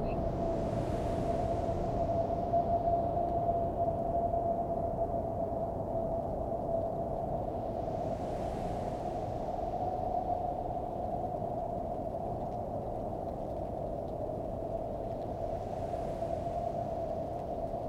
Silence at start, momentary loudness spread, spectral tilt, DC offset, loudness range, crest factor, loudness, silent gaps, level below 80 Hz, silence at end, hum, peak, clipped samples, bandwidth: 0 s; 6 LU; -9 dB/octave; under 0.1%; 6 LU; 16 dB; -35 LUFS; none; -46 dBFS; 0 s; none; -18 dBFS; under 0.1%; 11.5 kHz